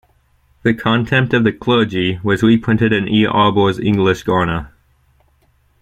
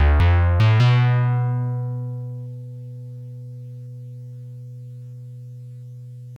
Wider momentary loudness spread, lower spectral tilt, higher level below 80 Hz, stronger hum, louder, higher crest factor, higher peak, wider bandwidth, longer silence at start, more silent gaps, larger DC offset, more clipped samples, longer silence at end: second, 5 LU vs 22 LU; about the same, -7 dB/octave vs -8 dB/octave; second, -42 dBFS vs -30 dBFS; neither; first, -15 LUFS vs -19 LUFS; about the same, 16 dB vs 12 dB; first, 0 dBFS vs -8 dBFS; first, 9.4 kHz vs 6.2 kHz; first, 0.65 s vs 0 s; neither; neither; neither; first, 1.15 s vs 0 s